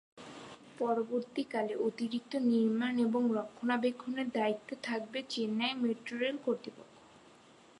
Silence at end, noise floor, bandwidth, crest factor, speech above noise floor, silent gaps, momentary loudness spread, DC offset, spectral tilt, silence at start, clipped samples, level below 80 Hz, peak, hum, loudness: 0.8 s; -60 dBFS; 11 kHz; 16 dB; 26 dB; none; 9 LU; under 0.1%; -5.5 dB/octave; 0.15 s; under 0.1%; -80 dBFS; -18 dBFS; none; -34 LUFS